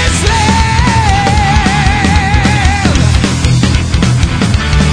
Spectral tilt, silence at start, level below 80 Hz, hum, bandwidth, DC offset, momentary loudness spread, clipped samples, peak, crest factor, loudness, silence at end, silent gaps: -5 dB/octave; 0 s; -16 dBFS; none; 10.5 kHz; 0.6%; 2 LU; 0.3%; 0 dBFS; 8 dB; -10 LUFS; 0 s; none